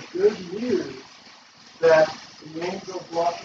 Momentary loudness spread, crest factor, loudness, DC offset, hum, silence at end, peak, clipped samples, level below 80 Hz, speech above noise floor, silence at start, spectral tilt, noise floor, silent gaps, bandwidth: 19 LU; 18 dB; -23 LUFS; under 0.1%; none; 0 s; -6 dBFS; under 0.1%; -66 dBFS; 27 dB; 0 s; -4.5 dB/octave; -49 dBFS; none; 7.8 kHz